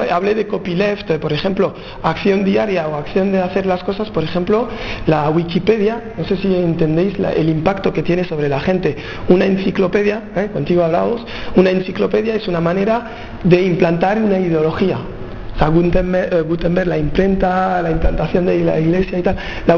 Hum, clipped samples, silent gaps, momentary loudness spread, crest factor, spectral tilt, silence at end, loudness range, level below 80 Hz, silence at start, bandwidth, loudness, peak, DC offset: none; under 0.1%; none; 6 LU; 16 dB; -8 dB/octave; 0 s; 2 LU; -32 dBFS; 0 s; 6.8 kHz; -16 LUFS; 0 dBFS; under 0.1%